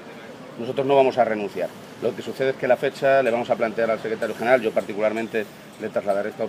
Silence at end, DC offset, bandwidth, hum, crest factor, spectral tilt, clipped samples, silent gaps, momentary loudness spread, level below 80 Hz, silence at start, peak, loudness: 0 s; under 0.1%; 15.5 kHz; none; 20 dB; -5.5 dB/octave; under 0.1%; none; 13 LU; -70 dBFS; 0 s; -4 dBFS; -23 LUFS